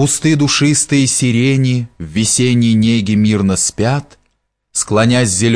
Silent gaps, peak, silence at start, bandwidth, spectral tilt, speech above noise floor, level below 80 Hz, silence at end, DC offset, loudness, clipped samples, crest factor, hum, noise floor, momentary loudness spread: none; -2 dBFS; 0 s; 11 kHz; -4.5 dB/octave; 52 dB; -44 dBFS; 0 s; 0.3%; -13 LUFS; under 0.1%; 12 dB; none; -65 dBFS; 6 LU